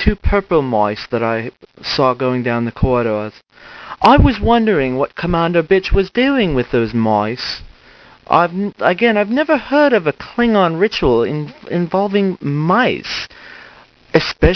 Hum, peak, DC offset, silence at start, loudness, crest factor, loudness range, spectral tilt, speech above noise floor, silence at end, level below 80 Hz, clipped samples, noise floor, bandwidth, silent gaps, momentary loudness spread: none; 0 dBFS; under 0.1%; 0 s; -16 LUFS; 16 dB; 3 LU; -7 dB/octave; 29 dB; 0 s; -28 dBFS; under 0.1%; -44 dBFS; 6.6 kHz; none; 10 LU